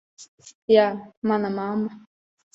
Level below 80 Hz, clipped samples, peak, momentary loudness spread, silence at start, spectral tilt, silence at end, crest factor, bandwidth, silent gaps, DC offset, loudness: -70 dBFS; under 0.1%; -6 dBFS; 12 LU; 0.2 s; -6 dB/octave; 0.55 s; 20 dB; 7.8 kHz; 0.28-0.38 s, 0.55-0.68 s, 1.17-1.22 s; under 0.1%; -23 LUFS